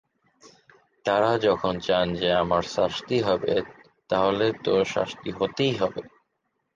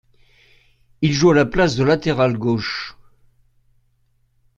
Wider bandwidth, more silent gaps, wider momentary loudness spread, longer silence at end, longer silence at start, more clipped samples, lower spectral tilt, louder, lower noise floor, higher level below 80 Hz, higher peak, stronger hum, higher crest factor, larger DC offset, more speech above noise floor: first, 9.2 kHz vs 7.8 kHz; neither; second, 7 LU vs 11 LU; second, 0.65 s vs 1.65 s; second, 0.45 s vs 1 s; neither; about the same, -5.5 dB/octave vs -6 dB/octave; second, -25 LUFS vs -18 LUFS; first, -76 dBFS vs -62 dBFS; second, -54 dBFS vs -44 dBFS; second, -8 dBFS vs -2 dBFS; neither; about the same, 16 dB vs 20 dB; neither; first, 52 dB vs 45 dB